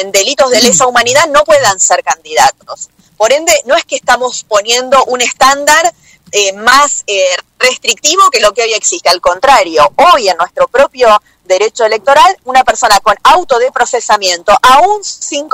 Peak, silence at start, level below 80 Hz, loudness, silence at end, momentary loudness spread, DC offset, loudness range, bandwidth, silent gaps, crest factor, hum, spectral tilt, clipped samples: 0 dBFS; 0 s; -42 dBFS; -8 LUFS; 0.05 s; 6 LU; under 0.1%; 2 LU; over 20 kHz; none; 8 dB; none; -0.5 dB/octave; 0.6%